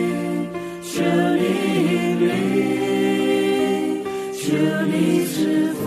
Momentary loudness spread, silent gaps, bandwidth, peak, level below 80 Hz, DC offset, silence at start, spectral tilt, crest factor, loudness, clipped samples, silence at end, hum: 7 LU; none; 14 kHz; -6 dBFS; -60 dBFS; under 0.1%; 0 s; -6 dB/octave; 14 dB; -20 LUFS; under 0.1%; 0 s; none